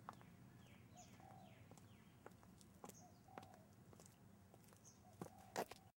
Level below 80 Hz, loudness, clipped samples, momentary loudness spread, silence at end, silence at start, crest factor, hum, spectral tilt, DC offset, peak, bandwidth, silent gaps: -82 dBFS; -60 LUFS; under 0.1%; 14 LU; 0.05 s; 0 s; 30 dB; none; -4.5 dB/octave; under 0.1%; -30 dBFS; 16 kHz; none